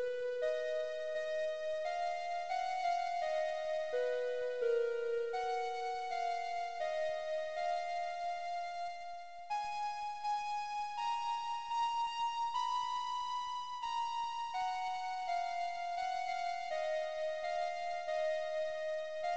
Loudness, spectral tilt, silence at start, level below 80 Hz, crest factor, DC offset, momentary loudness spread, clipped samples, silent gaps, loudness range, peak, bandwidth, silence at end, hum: -38 LUFS; -0.5 dB/octave; 0 s; -74 dBFS; 12 dB; 0.2%; 4 LU; under 0.1%; none; 3 LU; -24 dBFS; 8.8 kHz; 0 s; none